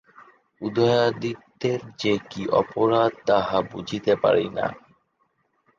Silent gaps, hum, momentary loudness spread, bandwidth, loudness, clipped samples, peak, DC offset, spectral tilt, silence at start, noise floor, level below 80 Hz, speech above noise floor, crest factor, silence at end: none; none; 10 LU; 7.4 kHz; -23 LUFS; under 0.1%; -6 dBFS; under 0.1%; -6 dB/octave; 0.2 s; -70 dBFS; -60 dBFS; 47 dB; 18 dB; 1 s